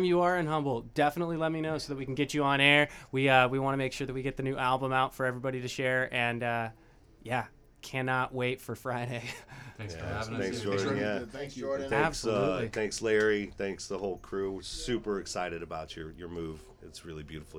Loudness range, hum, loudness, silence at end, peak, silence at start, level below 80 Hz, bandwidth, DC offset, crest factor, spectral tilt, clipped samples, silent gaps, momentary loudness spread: 8 LU; none; -31 LUFS; 0 s; -8 dBFS; 0 s; -54 dBFS; 17 kHz; under 0.1%; 24 dB; -5 dB/octave; under 0.1%; none; 16 LU